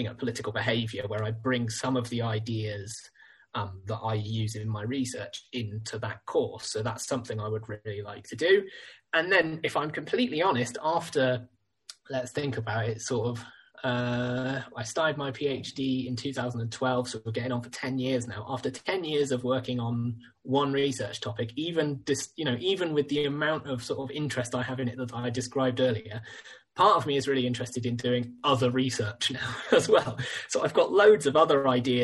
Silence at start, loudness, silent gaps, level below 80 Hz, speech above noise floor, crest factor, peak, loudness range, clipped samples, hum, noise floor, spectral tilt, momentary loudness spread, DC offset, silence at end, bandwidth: 0 s; -29 LUFS; none; -64 dBFS; 24 dB; 22 dB; -8 dBFS; 6 LU; under 0.1%; none; -53 dBFS; -5 dB/octave; 11 LU; under 0.1%; 0 s; 12 kHz